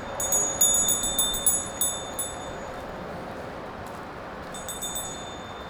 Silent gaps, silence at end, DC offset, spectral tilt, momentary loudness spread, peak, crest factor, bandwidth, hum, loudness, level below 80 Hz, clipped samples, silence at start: none; 0 s; under 0.1%; -1 dB/octave; 18 LU; -8 dBFS; 20 dB; over 20 kHz; none; -24 LUFS; -48 dBFS; under 0.1%; 0 s